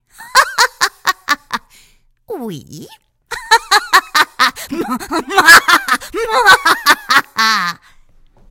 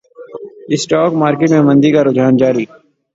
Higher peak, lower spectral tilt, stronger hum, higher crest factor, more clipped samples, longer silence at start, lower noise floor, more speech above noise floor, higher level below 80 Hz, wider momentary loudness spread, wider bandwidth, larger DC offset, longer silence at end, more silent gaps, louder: about the same, 0 dBFS vs 0 dBFS; second, -0.5 dB/octave vs -6.5 dB/octave; neither; about the same, 14 dB vs 12 dB; first, 0.7% vs under 0.1%; about the same, 0.2 s vs 0.2 s; first, -50 dBFS vs -31 dBFS; first, 38 dB vs 20 dB; first, -46 dBFS vs -54 dBFS; about the same, 19 LU vs 21 LU; first, over 20 kHz vs 8 kHz; neither; first, 0.75 s vs 0.5 s; neither; about the same, -11 LUFS vs -12 LUFS